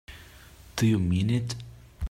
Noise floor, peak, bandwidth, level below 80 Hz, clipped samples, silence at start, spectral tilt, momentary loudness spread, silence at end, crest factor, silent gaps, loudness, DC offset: -50 dBFS; -12 dBFS; 15.5 kHz; -42 dBFS; under 0.1%; 0.1 s; -6 dB/octave; 23 LU; 0 s; 16 dB; none; -27 LUFS; under 0.1%